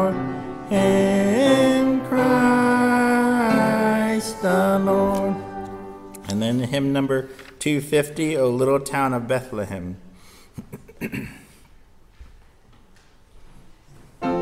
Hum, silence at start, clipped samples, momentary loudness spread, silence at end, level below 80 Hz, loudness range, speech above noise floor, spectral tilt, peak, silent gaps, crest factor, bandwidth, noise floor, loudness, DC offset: none; 0 s; under 0.1%; 17 LU; 0 s; -50 dBFS; 21 LU; 30 dB; -6 dB/octave; -6 dBFS; none; 16 dB; 16 kHz; -51 dBFS; -20 LUFS; under 0.1%